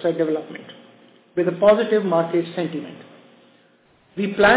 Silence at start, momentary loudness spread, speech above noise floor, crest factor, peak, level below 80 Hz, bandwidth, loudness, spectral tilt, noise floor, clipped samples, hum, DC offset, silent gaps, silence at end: 0 s; 21 LU; 38 dB; 18 dB; -2 dBFS; -56 dBFS; 4 kHz; -21 LUFS; -10 dB/octave; -57 dBFS; under 0.1%; none; under 0.1%; none; 0 s